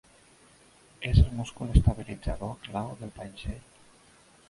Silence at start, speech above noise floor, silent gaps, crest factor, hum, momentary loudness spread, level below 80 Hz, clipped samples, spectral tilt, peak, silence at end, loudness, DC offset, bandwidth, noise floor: 1 s; 31 dB; none; 24 dB; none; 16 LU; -32 dBFS; under 0.1%; -7 dB/octave; -6 dBFS; 0.9 s; -29 LUFS; under 0.1%; 11.5 kHz; -58 dBFS